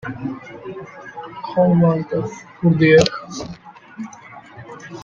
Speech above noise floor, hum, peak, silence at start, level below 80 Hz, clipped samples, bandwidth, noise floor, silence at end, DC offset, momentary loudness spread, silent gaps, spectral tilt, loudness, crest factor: 24 dB; none; 0 dBFS; 0.05 s; -52 dBFS; under 0.1%; 7.4 kHz; -40 dBFS; 0 s; under 0.1%; 25 LU; none; -6.5 dB/octave; -17 LUFS; 20 dB